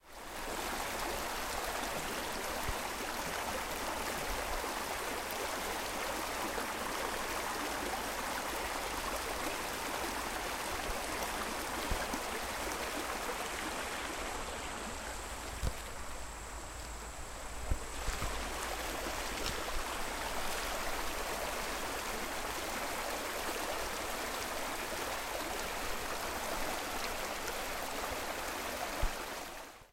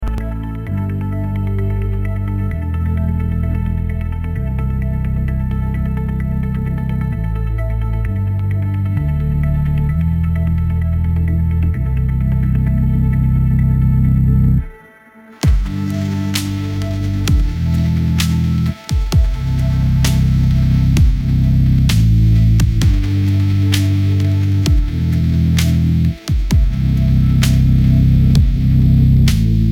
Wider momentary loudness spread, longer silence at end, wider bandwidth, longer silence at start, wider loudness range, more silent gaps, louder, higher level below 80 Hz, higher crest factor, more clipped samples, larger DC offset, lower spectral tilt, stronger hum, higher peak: second, 4 LU vs 8 LU; about the same, 0.05 s vs 0 s; about the same, 16.5 kHz vs 16.5 kHz; about the same, 0.05 s vs 0 s; second, 3 LU vs 6 LU; neither; second, -38 LUFS vs -16 LUFS; second, -48 dBFS vs -18 dBFS; first, 20 dB vs 14 dB; neither; neither; second, -2.5 dB/octave vs -7 dB/octave; neither; second, -18 dBFS vs 0 dBFS